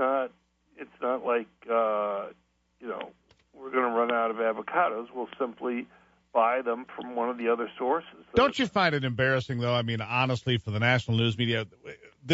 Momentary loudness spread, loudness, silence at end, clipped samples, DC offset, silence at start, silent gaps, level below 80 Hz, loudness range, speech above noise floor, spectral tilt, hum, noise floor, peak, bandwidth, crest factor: 14 LU; -28 LUFS; 0 s; under 0.1%; under 0.1%; 0 s; none; -60 dBFS; 4 LU; 37 dB; -6.5 dB/octave; none; -65 dBFS; -8 dBFS; 8 kHz; 20 dB